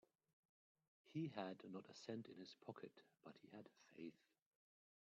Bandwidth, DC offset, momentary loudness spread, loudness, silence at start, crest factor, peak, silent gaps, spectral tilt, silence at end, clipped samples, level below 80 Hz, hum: 7.4 kHz; under 0.1%; 15 LU; -56 LUFS; 1.05 s; 24 dB; -32 dBFS; none; -5.5 dB/octave; 0.95 s; under 0.1%; under -90 dBFS; none